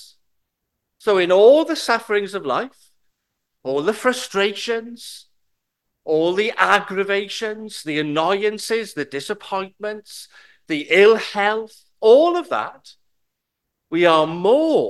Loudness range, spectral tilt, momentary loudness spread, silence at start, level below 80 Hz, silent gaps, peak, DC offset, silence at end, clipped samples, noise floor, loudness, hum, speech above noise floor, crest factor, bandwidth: 6 LU; -4 dB/octave; 17 LU; 1.05 s; -70 dBFS; none; 0 dBFS; under 0.1%; 0 s; under 0.1%; -79 dBFS; -19 LUFS; none; 60 dB; 20 dB; 12.5 kHz